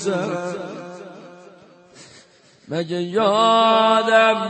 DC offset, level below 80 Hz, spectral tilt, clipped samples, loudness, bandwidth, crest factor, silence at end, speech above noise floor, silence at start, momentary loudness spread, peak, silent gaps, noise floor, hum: under 0.1%; -74 dBFS; -4.5 dB/octave; under 0.1%; -18 LUFS; 8.8 kHz; 18 dB; 0 s; 34 dB; 0 s; 21 LU; -4 dBFS; none; -51 dBFS; none